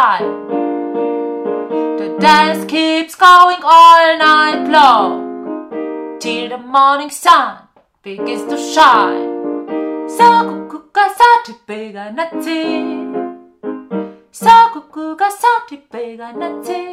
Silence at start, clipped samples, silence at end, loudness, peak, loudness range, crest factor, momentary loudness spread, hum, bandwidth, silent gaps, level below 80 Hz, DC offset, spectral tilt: 0 s; 1%; 0 s; -11 LUFS; 0 dBFS; 7 LU; 12 dB; 19 LU; none; 16 kHz; none; -56 dBFS; under 0.1%; -3.5 dB/octave